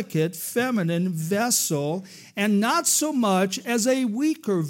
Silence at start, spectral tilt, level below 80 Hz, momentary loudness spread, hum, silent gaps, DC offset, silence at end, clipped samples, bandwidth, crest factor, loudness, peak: 0 s; -4 dB/octave; -80 dBFS; 6 LU; none; none; under 0.1%; 0 s; under 0.1%; 16.5 kHz; 16 dB; -23 LUFS; -8 dBFS